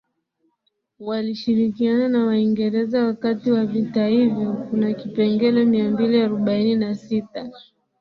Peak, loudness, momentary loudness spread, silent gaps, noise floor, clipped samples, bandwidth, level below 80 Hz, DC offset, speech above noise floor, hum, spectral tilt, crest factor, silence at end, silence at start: -6 dBFS; -20 LUFS; 8 LU; none; -72 dBFS; under 0.1%; 5.8 kHz; -62 dBFS; under 0.1%; 52 dB; none; -8.5 dB/octave; 14 dB; 0.4 s; 1 s